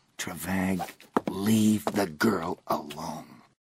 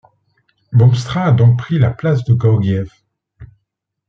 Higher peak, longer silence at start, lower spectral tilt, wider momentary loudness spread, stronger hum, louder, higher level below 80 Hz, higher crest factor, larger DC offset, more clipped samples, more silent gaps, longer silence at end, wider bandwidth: second, -10 dBFS vs -2 dBFS; second, 0.2 s vs 0.7 s; second, -5 dB/octave vs -8.5 dB/octave; first, 13 LU vs 7 LU; neither; second, -29 LUFS vs -14 LUFS; second, -62 dBFS vs -46 dBFS; about the same, 18 dB vs 14 dB; neither; neither; neither; second, 0.25 s vs 0.65 s; first, 16 kHz vs 7.4 kHz